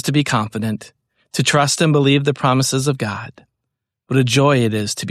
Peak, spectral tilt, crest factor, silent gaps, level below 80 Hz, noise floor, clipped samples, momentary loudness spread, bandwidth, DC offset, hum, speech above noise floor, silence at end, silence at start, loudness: -2 dBFS; -5 dB/octave; 14 dB; none; -56 dBFS; -79 dBFS; under 0.1%; 11 LU; 14 kHz; under 0.1%; none; 62 dB; 0 s; 0.05 s; -17 LUFS